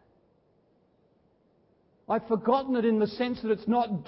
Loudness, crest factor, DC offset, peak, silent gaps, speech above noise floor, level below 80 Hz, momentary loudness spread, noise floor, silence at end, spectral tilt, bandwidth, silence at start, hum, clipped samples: -27 LUFS; 18 dB; under 0.1%; -12 dBFS; none; 40 dB; -66 dBFS; 6 LU; -67 dBFS; 0.05 s; -10.5 dB/octave; 5.8 kHz; 2.1 s; none; under 0.1%